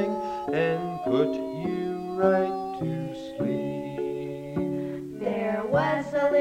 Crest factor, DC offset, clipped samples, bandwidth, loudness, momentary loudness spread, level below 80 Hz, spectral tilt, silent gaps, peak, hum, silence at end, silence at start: 18 dB; under 0.1%; under 0.1%; 15.5 kHz; -28 LUFS; 8 LU; -58 dBFS; -7.5 dB/octave; none; -8 dBFS; none; 0 s; 0 s